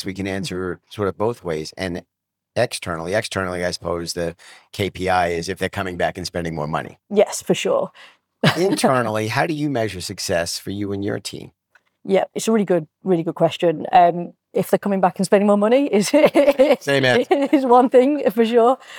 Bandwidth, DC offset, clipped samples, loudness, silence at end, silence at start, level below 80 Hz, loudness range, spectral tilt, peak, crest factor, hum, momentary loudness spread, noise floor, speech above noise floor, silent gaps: 19 kHz; under 0.1%; under 0.1%; -19 LUFS; 0 s; 0 s; -58 dBFS; 9 LU; -5 dB/octave; -4 dBFS; 16 dB; none; 12 LU; -49 dBFS; 29 dB; none